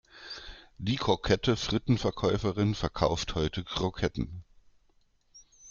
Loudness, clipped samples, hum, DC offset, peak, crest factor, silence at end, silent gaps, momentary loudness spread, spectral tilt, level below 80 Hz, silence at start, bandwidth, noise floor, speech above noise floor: -30 LUFS; under 0.1%; none; under 0.1%; -10 dBFS; 20 dB; 0 s; none; 16 LU; -5.5 dB/octave; -46 dBFS; 0.15 s; 7.4 kHz; -67 dBFS; 38 dB